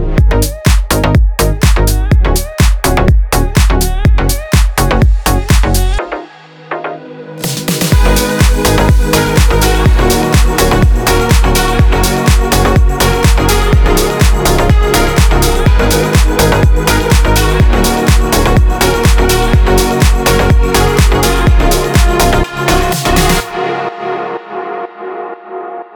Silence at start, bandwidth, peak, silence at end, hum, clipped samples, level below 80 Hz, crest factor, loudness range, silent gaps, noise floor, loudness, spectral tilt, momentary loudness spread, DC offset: 0 s; over 20 kHz; 0 dBFS; 0.15 s; none; under 0.1%; -12 dBFS; 10 dB; 4 LU; none; -33 dBFS; -11 LUFS; -5 dB/octave; 9 LU; under 0.1%